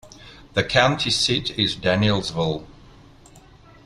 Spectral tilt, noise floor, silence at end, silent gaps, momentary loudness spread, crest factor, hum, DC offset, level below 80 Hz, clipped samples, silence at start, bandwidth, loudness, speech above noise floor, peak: -4 dB/octave; -48 dBFS; 0.45 s; none; 8 LU; 22 dB; none; under 0.1%; -46 dBFS; under 0.1%; 0.05 s; 12.5 kHz; -21 LUFS; 27 dB; -2 dBFS